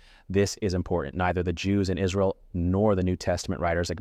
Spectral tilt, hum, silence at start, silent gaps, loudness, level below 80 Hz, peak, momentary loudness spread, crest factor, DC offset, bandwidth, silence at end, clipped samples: -6 dB/octave; none; 0.3 s; none; -27 LUFS; -44 dBFS; -12 dBFS; 5 LU; 14 dB; under 0.1%; 14 kHz; 0 s; under 0.1%